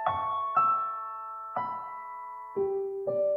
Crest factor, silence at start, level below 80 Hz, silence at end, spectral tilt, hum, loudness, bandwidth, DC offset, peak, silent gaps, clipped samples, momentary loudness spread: 16 dB; 0 s; -70 dBFS; 0 s; -7.5 dB/octave; none; -31 LUFS; 5.4 kHz; under 0.1%; -14 dBFS; none; under 0.1%; 14 LU